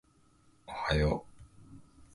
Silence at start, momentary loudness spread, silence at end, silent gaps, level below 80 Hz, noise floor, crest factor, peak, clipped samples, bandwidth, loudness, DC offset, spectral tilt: 0.7 s; 26 LU; 0.35 s; none; -44 dBFS; -65 dBFS; 22 dB; -14 dBFS; under 0.1%; 11.5 kHz; -33 LUFS; under 0.1%; -6.5 dB/octave